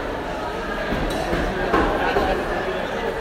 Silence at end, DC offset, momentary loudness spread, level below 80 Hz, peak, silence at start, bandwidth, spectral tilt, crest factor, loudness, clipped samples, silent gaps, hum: 0 s; under 0.1%; 7 LU; -32 dBFS; -6 dBFS; 0 s; 16 kHz; -5.5 dB/octave; 16 dB; -23 LUFS; under 0.1%; none; none